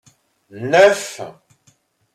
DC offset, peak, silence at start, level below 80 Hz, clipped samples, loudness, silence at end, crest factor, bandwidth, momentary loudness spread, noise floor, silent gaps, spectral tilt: under 0.1%; -2 dBFS; 0.55 s; -64 dBFS; under 0.1%; -14 LUFS; 0.85 s; 18 dB; 14.5 kHz; 21 LU; -59 dBFS; none; -3.5 dB/octave